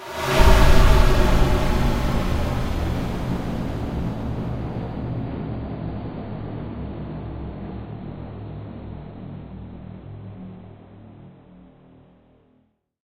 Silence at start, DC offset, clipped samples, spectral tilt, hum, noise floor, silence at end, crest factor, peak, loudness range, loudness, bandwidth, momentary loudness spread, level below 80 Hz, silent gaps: 0 s; under 0.1%; under 0.1%; -6 dB/octave; none; -64 dBFS; 1.75 s; 20 dB; -2 dBFS; 19 LU; -24 LUFS; 16 kHz; 21 LU; -24 dBFS; none